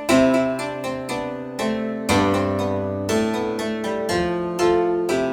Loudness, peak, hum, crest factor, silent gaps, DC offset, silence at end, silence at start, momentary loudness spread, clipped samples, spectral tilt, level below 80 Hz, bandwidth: -22 LUFS; -4 dBFS; none; 16 dB; none; under 0.1%; 0 s; 0 s; 8 LU; under 0.1%; -5 dB/octave; -48 dBFS; 17.5 kHz